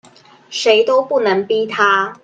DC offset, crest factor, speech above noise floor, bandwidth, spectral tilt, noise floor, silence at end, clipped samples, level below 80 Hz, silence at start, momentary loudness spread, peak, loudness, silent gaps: under 0.1%; 16 dB; 29 dB; 9 kHz; -3 dB/octave; -44 dBFS; 0.1 s; under 0.1%; -68 dBFS; 0.5 s; 6 LU; 0 dBFS; -15 LUFS; none